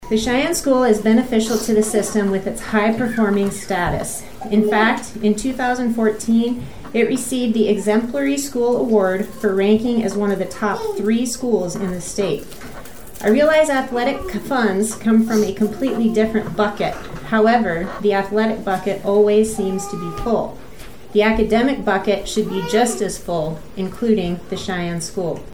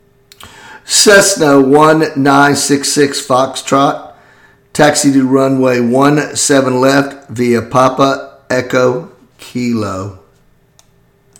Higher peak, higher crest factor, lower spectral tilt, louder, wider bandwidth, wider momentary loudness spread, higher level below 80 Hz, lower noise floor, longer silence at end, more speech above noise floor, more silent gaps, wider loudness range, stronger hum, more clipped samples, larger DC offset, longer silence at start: about the same, -2 dBFS vs 0 dBFS; about the same, 16 dB vs 12 dB; about the same, -5 dB/octave vs -4 dB/octave; second, -19 LUFS vs -10 LUFS; about the same, 18.5 kHz vs 19 kHz; second, 9 LU vs 13 LU; first, -40 dBFS vs -50 dBFS; second, -38 dBFS vs -50 dBFS; second, 0 s vs 1.25 s; second, 20 dB vs 40 dB; neither; second, 2 LU vs 6 LU; neither; second, under 0.1% vs 0.5%; first, 1% vs under 0.1%; second, 0 s vs 0.45 s